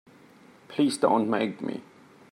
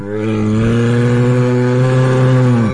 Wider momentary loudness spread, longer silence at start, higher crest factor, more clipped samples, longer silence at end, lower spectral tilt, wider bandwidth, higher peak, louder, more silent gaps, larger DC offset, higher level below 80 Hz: first, 13 LU vs 4 LU; first, 0.7 s vs 0 s; first, 20 dB vs 8 dB; neither; first, 0.5 s vs 0 s; second, -5 dB/octave vs -8 dB/octave; first, 12.5 kHz vs 10 kHz; second, -8 dBFS vs -4 dBFS; second, -26 LUFS vs -13 LUFS; neither; neither; second, -78 dBFS vs -38 dBFS